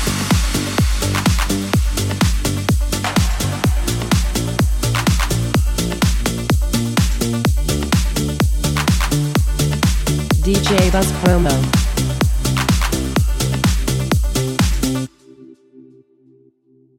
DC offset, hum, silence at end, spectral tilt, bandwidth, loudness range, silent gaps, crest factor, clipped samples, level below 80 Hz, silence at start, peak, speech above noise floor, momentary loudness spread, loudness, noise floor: under 0.1%; none; 1.15 s; -5 dB/octave; 17 kHz; 2 LU; none; 16 dB; under 0.1%; -22 dBFS; 0 s; 0 dBFS; 40 dB; 4 LU; -17 LUFS; -54 dBFS